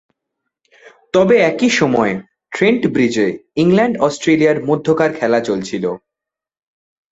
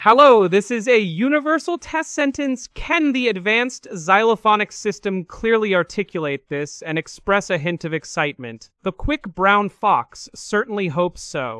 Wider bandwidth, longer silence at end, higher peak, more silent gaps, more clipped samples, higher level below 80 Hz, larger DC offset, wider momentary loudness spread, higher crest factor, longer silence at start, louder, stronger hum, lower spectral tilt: second, 8 kHz vs 12 kHz; first, 1.15 s vs 0 s; about the same, 0 dBFS vs 0 dBFS; neither; neither; second, -54 dBFS vs -44 dBFS; neither; about the same, 9 LU vs 11 LU; about the same, 16 dB vs 20 dB; first, 1.15 s vs 0 s; first, -15 LUFS vs -19 LUFS; neither; about the same, -5.5 dB/octave vs -4.5 dB/octave